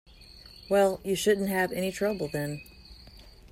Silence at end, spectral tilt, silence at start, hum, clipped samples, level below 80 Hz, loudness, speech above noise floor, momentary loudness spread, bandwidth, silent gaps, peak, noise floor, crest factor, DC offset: 0.05 s; -4.5 dB/octave; 0.2 s; none; under 0.1%; -54 dBFS; -28 LUFS; 23 dB; 23 LU; 16 kHz; none; -12 dBFS; -51 dBFS; 18 dB; under 0.1%